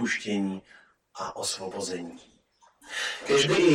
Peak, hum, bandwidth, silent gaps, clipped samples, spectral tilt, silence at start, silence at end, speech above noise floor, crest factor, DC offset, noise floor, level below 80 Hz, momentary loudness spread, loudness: -8 dBFS; none; 15.5 kHz; none; under 0.1%; -3.5 dB/octave; 0 s; 0 s; 34 dB; 20 dB; under 0.1%; -62 dBFS; -66 dBFS; 16 LU; -28 LUFS